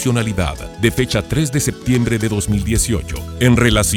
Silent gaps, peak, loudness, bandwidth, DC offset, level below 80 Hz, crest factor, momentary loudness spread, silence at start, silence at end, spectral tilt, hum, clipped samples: none; 0 dBFS; -17 LUFS; 18 kHz; under 0.1%; -28 dBFS; 16 dB; 8 LU; 0 s; 0 s; -5 dB/octave; none; under 0.1%